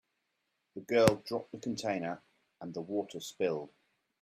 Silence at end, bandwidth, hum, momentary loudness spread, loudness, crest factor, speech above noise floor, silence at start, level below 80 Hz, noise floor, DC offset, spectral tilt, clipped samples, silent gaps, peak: 0.55 s; 15 kHz; none; 21 LU; -34 LUFS; 32 dB; 49 dB; 0.75 s; -68 dBFS; -82 dBFS; under 0.1%; -5 dB/octave; under 0.1%; none; -4 dBFS